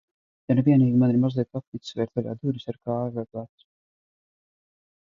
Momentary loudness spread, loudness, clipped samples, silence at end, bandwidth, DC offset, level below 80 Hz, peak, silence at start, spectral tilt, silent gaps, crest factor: 17 LU; -24 LUFS; under 0.1%; 1.6 s; 7.2 kHz; under 0.1%; -64 dBFS; -8 dBFS; 0.5 s; -9.5 dB/octave; 1.67-1.72 s; 18 dB